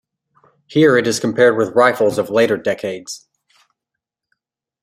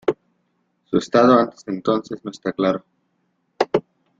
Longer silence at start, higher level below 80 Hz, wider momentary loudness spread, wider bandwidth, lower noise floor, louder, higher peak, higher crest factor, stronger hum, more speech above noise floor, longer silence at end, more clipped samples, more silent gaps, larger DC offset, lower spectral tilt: first, 0.7 s vs 0.05 s; about the same, -62 dBFS vs -60 dBFS; about the same, 14 LU vs 14 LU; first, 15.5 kHz vs 7.8 kHz; first, -82 dBFS vs -69 dBFS; first, -15 LUFS vs -20 LUFS; about the same, -2 dBFS vs -2 dBFS; about the same, 16 dB vs 20 dB; neither; first, 67 dB vs 50 dB; first, 1.65 s vs 0.4 s; neither; neither; neither; second, -5 dB/octave vs -6.5 dB/octave